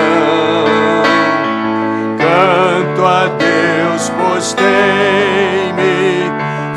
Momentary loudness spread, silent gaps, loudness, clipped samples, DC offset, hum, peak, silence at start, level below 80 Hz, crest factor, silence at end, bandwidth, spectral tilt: 5 LU; none; -12 LUFS; under 0.1%; under 0.1%; none; 0 dBFS; 0 s; -56 dBFS; 12 dB; 0 s; 12.5 kHz; -4.5 dB/octave